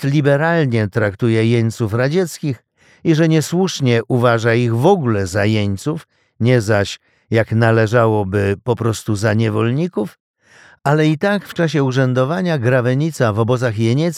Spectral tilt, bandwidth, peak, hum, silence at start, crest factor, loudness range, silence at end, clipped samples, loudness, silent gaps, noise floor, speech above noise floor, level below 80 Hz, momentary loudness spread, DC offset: -6.5 dB/octave; 14.5 kHz; -2 dBFS; none; 0 s; 14 dB; 2 LU; 0 s; under 0.1%; -16 LUFS; 10.20-10.34 s; -48 dBFS; 32 dB; -56 dBFS; 7 LU; under 0.1%